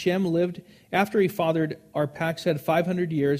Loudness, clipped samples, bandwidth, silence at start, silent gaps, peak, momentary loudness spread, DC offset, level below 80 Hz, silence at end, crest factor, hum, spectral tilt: -25 LUFS; under 0.1%; 15.5 kHz; 0 s; none; -6 dBFS; 6 LU; under 0.1%; -64 dBFS; 0 s; 18 dB; none; -7 dB/octave